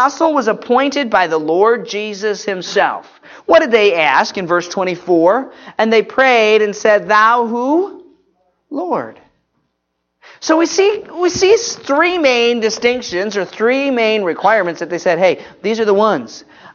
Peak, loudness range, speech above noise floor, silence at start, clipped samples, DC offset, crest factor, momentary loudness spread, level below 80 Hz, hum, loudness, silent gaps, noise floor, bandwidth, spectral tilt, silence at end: 0 dBFS; 5 LU; 57 dB; 0 s; under 0.1%; under 0.1%; 14 dB; 10 LU; -58 dBFS; none; -14 LUFS; none; -71 dBFS; 7.4 kHz; -3.5 dB/octave; 0.05 s